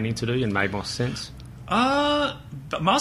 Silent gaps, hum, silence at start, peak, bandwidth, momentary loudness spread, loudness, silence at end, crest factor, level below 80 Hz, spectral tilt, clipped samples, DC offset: none; none; 0 s; -6 dBFS; 14 kHz; 15 LU; -24 LUFS; 0 s; 18 dB; -46 dBFS; -5 dB/octave; under 0.1%; under 0.1%